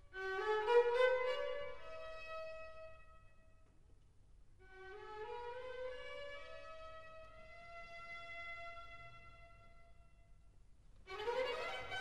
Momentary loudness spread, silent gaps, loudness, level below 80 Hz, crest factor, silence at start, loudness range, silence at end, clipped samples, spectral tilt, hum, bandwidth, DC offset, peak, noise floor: 23 LU; none; -41 LUFS; -64 dBFS; 24 dB; 0 s; 15 LU; 0 s; under 0.1%; -3.5 dB/octave; none; 10 kHz; 0.1%; -20 dBFS; -65 dBFS